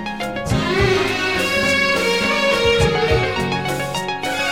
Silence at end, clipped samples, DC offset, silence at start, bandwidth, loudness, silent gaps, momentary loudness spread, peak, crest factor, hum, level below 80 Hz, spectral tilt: 0 s; under 0.1%; 0.7%; 0 s; 17 kHz; -18 LUFS; none; 7 LU; -2 dBFS; 16 dB; none; -34 dBFS; -4 dB/octave